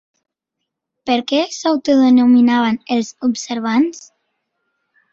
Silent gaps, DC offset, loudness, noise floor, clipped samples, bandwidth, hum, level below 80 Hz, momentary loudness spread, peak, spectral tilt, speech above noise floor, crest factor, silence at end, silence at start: none; under 0.1%; -15 LUFS; -78 dBFS; under 0.1%; 7.6 kHz; none; -62 dBFS; 10 LU; -2 dBFS; -4 dB/octave; 64 dB; 14 dB; 1.1 s; 1.05 s